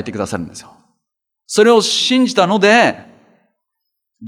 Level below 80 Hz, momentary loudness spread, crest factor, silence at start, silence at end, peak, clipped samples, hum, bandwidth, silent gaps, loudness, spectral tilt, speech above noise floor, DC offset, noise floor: -62 dBFS; 15 LU; 16 dB; 0 s; 0 s; 0 dBFS; under 0.1%; none; 15 kHz; none; -13 LUFS; -3.5 dB/octave; 64 dB; under 0.1%; -77 dBFS